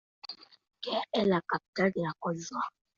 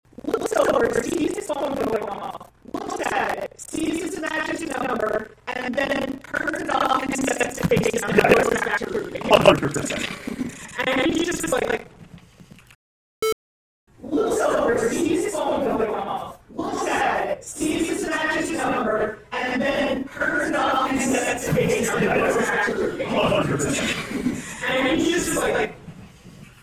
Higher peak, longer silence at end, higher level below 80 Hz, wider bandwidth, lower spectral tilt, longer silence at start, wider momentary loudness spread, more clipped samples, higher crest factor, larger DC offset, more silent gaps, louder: second, -14 dBFS vs 0 dBFS; about the same, 0.3 s vs 0.2 s; second, -70 dBFS vs -48 dBFS; second, 7.6 kHz vs 16 kHz; first, -5.5 dB/octave vs -4 dB/octave; about the same, 0.25 s vs 0.25 s; first, 17 LU vs 9 LU; neither; about the same, 20 dB vs 24 dB; neither; second, 1.68-1.73 s vs 12.75-13.22 s, 13.32-13.87 s; second, -32 LUFS vs -23 LUFS